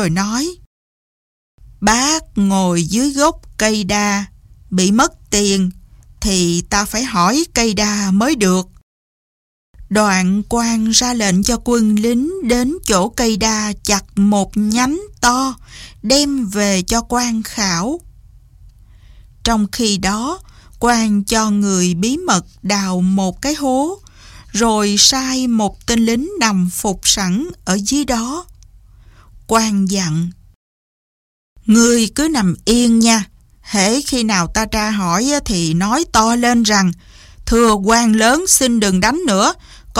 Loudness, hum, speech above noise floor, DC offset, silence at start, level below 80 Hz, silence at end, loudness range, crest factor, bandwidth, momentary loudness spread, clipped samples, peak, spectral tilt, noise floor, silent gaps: -15 LUFS; none; 29 dB; under 0.1%; 0 s; -36 dBFS; 0 s; 5 LU; 16 dB; 16.5 kHz; 7 LU; under 0.1%; 0 dBFS; -3.5 dB/octave; -44 dBFS; 0.66-1.58 s, 8.83-9.74 s, 30.56-31.56 s